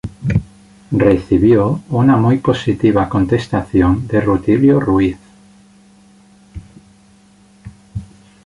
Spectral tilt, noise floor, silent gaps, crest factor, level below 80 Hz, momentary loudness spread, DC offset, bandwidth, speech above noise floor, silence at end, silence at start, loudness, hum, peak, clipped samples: -8.5 dB/octave; -48 dBFS; none; 14 dB; -34 dBFS; 9 LU; under 0.1%; 11 kHz; 35 dB; 0.4 s; 0.05 s; -14 LUFS; none; -2 dBFS; under 0.1%